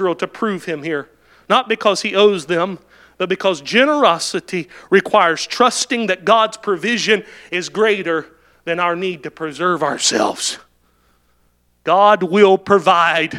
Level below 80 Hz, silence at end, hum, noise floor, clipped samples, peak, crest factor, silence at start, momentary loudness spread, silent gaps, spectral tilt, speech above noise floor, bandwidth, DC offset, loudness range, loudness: -62 dBFS; 0 s; 60 Hz at -50 dBFS; -60 dBFS; under 0.1%; 0 dBFS; 16 dB; 0 s; 12 LU; none; -3 dB/octave; 43 dB; 13.5 kHz; under 0.1%; 4 LU; -16 LUFS